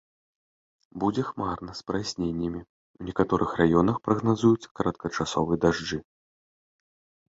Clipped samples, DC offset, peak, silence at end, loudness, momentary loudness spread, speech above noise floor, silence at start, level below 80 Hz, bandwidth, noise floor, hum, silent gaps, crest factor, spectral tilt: under 0.1%; under 0.1%; -6 dBFS; 1.3 s; -27 LUFS; 11 LU; over 64 dB; 0.95 s; -50 dBFS; 7.8 kHz; under -90 dBFS; none; 2.69-2.94 s, 4.71-4.75 s; 20 dB; -6.5 dB/octave